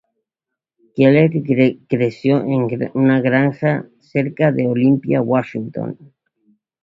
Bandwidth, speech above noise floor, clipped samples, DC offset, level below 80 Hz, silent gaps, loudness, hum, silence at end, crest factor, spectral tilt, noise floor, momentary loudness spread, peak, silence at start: 5.6 kHz; 67 dB; under 0.1%; under 0.1%; -56 dBFS; none; -17 LUFS; none; 0.9 s; 16 dB; -9.5 dB/octave; -84 dBFS; 12 LU; 0 dBFS; 0.95 s